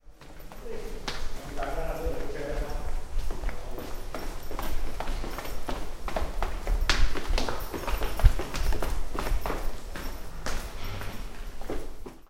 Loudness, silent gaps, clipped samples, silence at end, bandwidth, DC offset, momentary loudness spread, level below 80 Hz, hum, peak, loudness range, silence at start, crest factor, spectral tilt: -34 LUFS; none; under 0.1%; 0.1 s; 15.5 kHz; under 0.1%; 12 LU; -30 dBFS; none; -2 dBFS; 6 LU; 0.05 s; 24 dB; -4.5 dB/octave